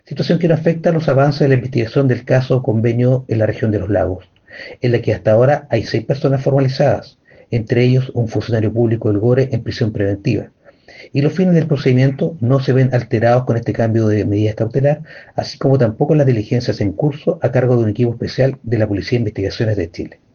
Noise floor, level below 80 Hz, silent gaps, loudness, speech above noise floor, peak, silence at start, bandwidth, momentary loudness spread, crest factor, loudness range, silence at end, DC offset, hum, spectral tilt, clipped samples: -41 dBFS; -46 dBFS; none; -16 LUFS; 26 dB; -2 dBFS; 0.1 s; 6.8 kHz; 7 LU; 14 dB; 2 LU; 0.25 s; under 0.1%; none; -8.5 dB/octave; under 0.1%